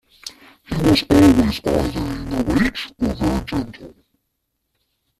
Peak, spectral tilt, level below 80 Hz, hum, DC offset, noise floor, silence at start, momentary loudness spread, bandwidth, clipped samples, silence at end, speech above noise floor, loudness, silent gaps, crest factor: -2 dBFS; -6 dB/octave; -34 dBFS; none; under 0.1%; -74 dBFS; 0.25 s; 18 LU; 14.5 kHz; under 0.1%; 1.3 s; 56 dB; -18 LUFS; none; 18 dB